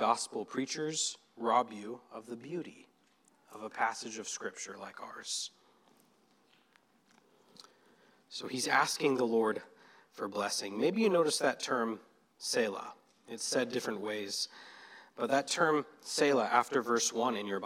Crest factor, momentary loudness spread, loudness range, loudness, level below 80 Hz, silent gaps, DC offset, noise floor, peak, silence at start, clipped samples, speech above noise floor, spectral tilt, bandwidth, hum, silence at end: 22 dB; 17 LU; 12 LU; -33 LUFS; under -90 dBFS; none; under 0.1%; -69 dBFS; -12 dBFS; 0 s; under 0.1%; 36 dB; -2.5 dB/octave; 16 kHz; none; 0 s